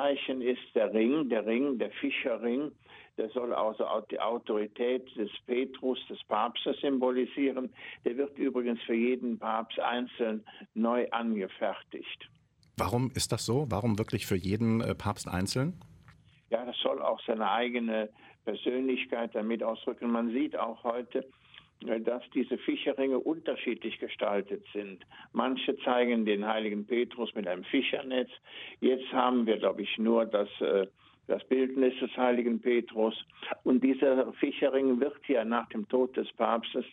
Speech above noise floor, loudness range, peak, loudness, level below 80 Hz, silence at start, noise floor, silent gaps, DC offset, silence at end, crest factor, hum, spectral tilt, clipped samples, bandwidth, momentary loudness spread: 29 dB; 4 LU; -12 dBFS; -31 LUFS; -64 dBFS; 0 s; -59 dBFS; none; under 0.1%; 0 s; 20 dB; none; -5.5 dB/octave; under 0.1%; 13.5 kHz; 10 LU